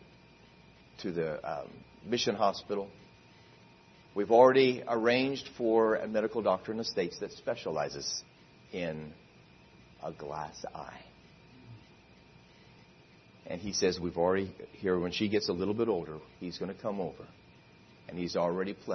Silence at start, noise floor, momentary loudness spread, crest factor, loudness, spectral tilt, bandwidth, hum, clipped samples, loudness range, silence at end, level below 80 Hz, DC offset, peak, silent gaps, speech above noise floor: 1 s; -59 dBFS; 17 LU; 24 dB; -31 LUFS; -4.5 dB/octave; 6.4 kHz; none; under 0.1%; 18 LU; 0 s; -66 dBFS; under 0.1%; -10 dBFS; none; 27 dB